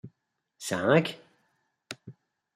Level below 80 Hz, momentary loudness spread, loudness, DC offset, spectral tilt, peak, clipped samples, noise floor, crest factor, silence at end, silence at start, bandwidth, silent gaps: -72 dBFS; 21 LU; -27 LUFS; under 0.1%; -5 dB/octave; -8 dBFS; under 0.1%; -77 dBFS; 22 dB; 0.45 s; 0.05 s; 15.5 kHz; none